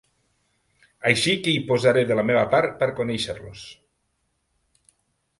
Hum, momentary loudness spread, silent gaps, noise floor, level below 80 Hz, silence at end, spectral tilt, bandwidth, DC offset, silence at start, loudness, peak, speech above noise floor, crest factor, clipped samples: none; 17 LU; none; -73 dBFS; -58 dBFS; 1.65 s; -4.5 dB/octave; 11.5 kHz; under 0.1%; 1.05 s; -21 LUFS; -2 dBFS; 51 dB; 24 dB; under 0.1%